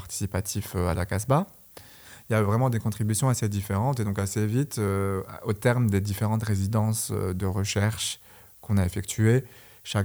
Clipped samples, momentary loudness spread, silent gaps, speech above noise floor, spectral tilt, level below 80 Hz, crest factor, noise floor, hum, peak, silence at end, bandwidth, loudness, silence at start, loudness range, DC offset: under 0.1%; 11 LU; none; 22 dB; -5.5 dB/octave; -54 dBFS; 16 dB; -48 dBFS; none; -10 dBFS; 0 s; over 20 kHz; -26 LUFS; 0 s; 1 LU; under 0.1%